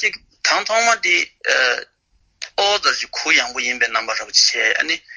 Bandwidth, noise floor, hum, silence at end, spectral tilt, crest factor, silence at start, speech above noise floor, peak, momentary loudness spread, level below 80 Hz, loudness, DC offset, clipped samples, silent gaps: 8 kHz; -55 dBFS; none; 0 s; 1.5 dB/octave; 18 dB; 0 s; 37 dB; -2 dBFS; 7 LU; -60 dBFS; -16 LUFS; under 0.1%; under 0.1%; none